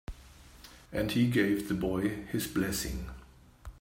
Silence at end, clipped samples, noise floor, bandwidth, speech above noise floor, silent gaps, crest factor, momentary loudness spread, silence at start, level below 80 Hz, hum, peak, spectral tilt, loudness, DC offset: 0 s; under 0.1%; -54 dBFS; 16 kHz; 23 dB; none; 20 dB; 25 LU; 0.1 s; -48 dBFS; none; -14 dBFS; -5.5 dB/octave; -31 LUFS; under 0.1%